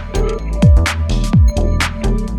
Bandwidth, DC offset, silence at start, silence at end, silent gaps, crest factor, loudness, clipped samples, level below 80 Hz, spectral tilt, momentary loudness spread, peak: 13 kHz; under 0.1%; 0 s; 0 s; none; 12 dB; -15 LUFS; under 0.1%; -16 dBFS; -6 dB/octave; 8 LU; 0 dBFS